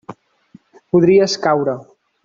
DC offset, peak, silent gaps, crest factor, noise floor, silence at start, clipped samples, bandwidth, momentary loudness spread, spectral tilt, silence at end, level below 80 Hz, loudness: under 0.1%; -2 dBFS; none; 14 dB; -49 dBFS; 0.1 s; under 0.1%; 7.6 kHz; 10 LU; -5.5 dB/octave; 0.4 s; -56 dBFS; -15 LUFS